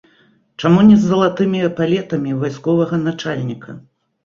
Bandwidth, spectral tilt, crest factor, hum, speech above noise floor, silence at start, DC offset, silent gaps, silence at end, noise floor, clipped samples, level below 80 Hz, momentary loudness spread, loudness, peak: 7.2 kHz; -7.5 dB/octave; 14 dB; none; 40 dB; 0.6 s; under 0.1%; none; 0.45 s; -55 dBFS; under 0.1%; -50 dBFS; 14 LU; -16 LUFS; -2 dBFS